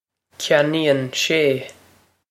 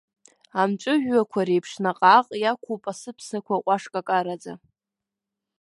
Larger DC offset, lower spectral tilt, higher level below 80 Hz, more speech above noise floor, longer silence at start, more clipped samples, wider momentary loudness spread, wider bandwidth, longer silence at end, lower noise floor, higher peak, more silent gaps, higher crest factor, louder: neither; about the same, -4 dB/octave vs -5 dB/octave; first, -68 dBFS vs -74 dBFS; second, 37 dB vs 64 dB; second, 0.4 s vs 0.55 s; neither; second, 11 LU vs 17 LU; first, 16 kHz vs 11.5 kHz; second, 0.6 s vs 1.05 s; second, -56 dBFS vs -87 dBFS; about the same, -2 dBFS vs -2 dBFS; neither; about the same, 20 dB vs 22 dB; first, -19 LUFS vs -23 LUFS